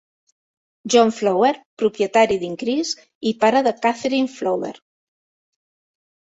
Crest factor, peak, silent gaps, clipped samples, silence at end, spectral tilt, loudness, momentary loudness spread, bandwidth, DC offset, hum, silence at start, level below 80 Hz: 18 dB; -2 dBFS; 1.65-1.77 s, 3.15-3.21 s; under 0.1%; 1.55 s; -4 dB/octave; -19 LUFS; 9 LU; 8.2 kHz; under 0.1%; none; 0.85 s; -62 dBFS